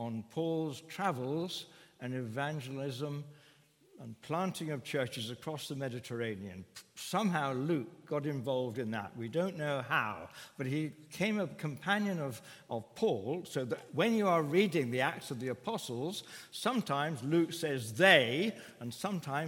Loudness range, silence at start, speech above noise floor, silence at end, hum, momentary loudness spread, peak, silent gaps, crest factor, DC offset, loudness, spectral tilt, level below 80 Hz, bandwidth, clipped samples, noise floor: 8 LU; 0 s; 30 dB; 0 s; none; 13 LU; -8 dBFS; none; 26 dB; under 0.1%; -35 LUFS; -5 dB/octave; -80 dBFS; 17 kHz; under 0.1%; -65 dBFS